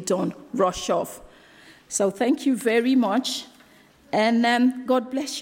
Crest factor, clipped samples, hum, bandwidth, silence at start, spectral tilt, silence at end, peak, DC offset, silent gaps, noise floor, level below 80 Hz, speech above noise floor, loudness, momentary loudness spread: 14 dB; under 0.1%; none; 16.5 kHz; 0 s; -4 dB/octave; 0 s; -8 dBFS; under 0.1%; none; -54 dBFS; -60 dBFS; 31 dB; -23 LUFS; 9 LU